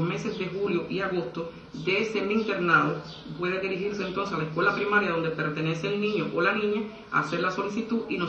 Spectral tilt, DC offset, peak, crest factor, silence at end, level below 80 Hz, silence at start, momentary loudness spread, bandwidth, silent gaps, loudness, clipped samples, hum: -6 dB/octave; under 0.1%; -8 dBFS; 18 dB; 0 s; -60 dBFS; 0 s; 9 LU; 8.4 kHz; none; -27 LUFS; under 0.1%; none